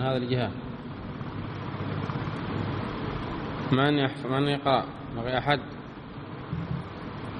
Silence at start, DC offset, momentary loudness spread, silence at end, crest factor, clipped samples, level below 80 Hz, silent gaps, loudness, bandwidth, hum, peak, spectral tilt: 0 s; under 0.1%; 13 LU; 0 s; 22 dB; under 0.1%; -50 dBFS; none; -30 LUFS; 10 kHz; none; -8 dBFS; -8 dB/octave